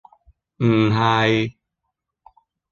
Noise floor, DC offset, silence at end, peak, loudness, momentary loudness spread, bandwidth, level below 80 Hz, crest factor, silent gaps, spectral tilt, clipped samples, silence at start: -79 dBFS; under 0.1%; 1.2 s; -4 dBFS; -19 LUFS; 6 LU; 7.2 kHz; -54 dBFS; 18 dB; none; -7 dB/octave; under 0.1%; 0.6 s